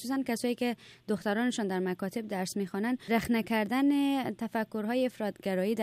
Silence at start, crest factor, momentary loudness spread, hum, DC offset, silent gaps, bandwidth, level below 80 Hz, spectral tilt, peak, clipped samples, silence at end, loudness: 0 s; 16 dB; 7 LU; none; under 0.1%; none; 15 kHz; -66 dBFS; -5.5 dB/octave; -14 dBFS; under 0.1%; 0 s; -31 LUFS